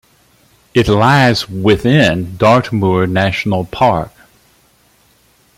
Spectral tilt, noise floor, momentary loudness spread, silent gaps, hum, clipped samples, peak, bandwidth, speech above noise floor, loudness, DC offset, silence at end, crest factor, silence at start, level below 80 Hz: -6.5 dB/octave; -52 dBFS; 7 LU; none; none; under 0.1%; 0 dBFS; 16 kHz; 40 dB; -13 LUFS; under 0.1%; 1.5 s; 14 dB; 0.75 s; -40 dBFS